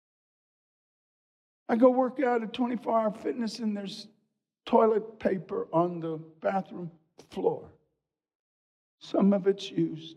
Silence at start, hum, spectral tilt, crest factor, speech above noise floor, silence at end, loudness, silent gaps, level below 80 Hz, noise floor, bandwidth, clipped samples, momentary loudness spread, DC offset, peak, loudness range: 1.7 s; none; -7 dB/octave; 20 dB; 55 dB; 0.05 s; -28 LUFS; 8.35-8.98 s; -74 dBFS; -83 dBFS; 10.5 kHz; under 0.1%; 17 LU; under 0.1%; -10 dBFS; 5 LU